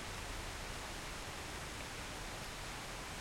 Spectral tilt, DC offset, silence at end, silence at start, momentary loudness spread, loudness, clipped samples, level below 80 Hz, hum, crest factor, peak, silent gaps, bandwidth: -3 dB/octave; under 0.1%; 0 s; 0 s; 1 LU; -45 LUFS; under 0.1%; -52 dBFS; none; 14 dB; -32 dBFS; none; 16.5 kHz